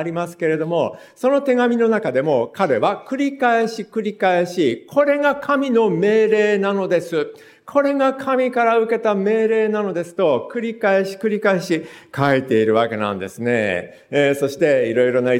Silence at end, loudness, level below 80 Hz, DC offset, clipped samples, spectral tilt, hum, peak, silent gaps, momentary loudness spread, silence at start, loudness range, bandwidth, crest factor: 0 s; -19 LUFS; -68 dBFS; under 0.1%; under 0.1%; -6 dB/octave; none; -2 dBFS; none; 7 LU; 0 s; 2 LU; 16 kHz; 16 dB